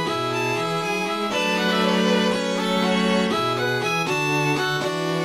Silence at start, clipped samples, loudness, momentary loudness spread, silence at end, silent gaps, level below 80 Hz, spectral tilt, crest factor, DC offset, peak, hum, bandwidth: 0 s; under 0.1%; -21 LUFS; 4 LU; 0 s; none; -62 dBFS; -4.5 dB/octave; 14 dB; under 0.1%; -8 dBFS; none; 15.5 kHz